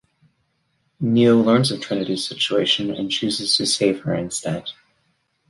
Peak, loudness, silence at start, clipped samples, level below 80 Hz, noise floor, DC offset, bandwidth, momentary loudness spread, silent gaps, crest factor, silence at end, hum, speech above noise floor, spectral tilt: -4 dBFS; -20 LUFS; 1 s; under 0.1%; -58 dBFS; -68 dBFS; under 0.1%; 11.5 kHz; 10 LU; none; 18 dB; 0.75 s; none; 49 dB; -4.5 dB/octave